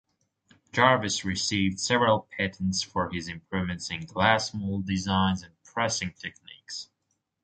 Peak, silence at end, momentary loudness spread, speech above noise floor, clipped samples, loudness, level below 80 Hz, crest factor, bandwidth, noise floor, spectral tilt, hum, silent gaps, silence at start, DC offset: -4 dBFS; 0.6 s; 15 LU; 51 dB; under 0.1%; -27 LUFS; -50 dBFS; 24 dB; 9.2 kHz; -78 dBFS; -4 dB/octave; none; none; 0.75 s; under 0.1%